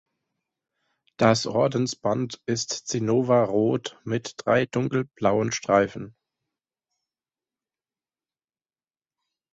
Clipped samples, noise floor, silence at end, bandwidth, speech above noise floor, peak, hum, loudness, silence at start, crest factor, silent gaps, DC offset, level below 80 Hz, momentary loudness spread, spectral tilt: under 0.1%; under -90 dBFS; 3.4 s; 8.2 kHz; over 66 dB; -6 dBFS; none; -24 LUFS; 1.2 s; 22 dB; none; under 0.1%; -62 dBFS; 9 LU; -5 dB/octave